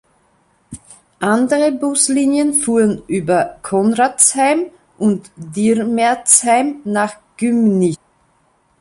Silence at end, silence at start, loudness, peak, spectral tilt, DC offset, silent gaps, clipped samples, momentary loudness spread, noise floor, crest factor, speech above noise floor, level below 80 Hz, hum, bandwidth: 0.85 s; 0.7 s; -15 LUFS; 0 dBFS; -4 dB/octave; under 0.1%; none; under 0.1%; 10 LU; -58 dBFS; 16 dB; 44 dB; -54 dBFS; none; 13 kHz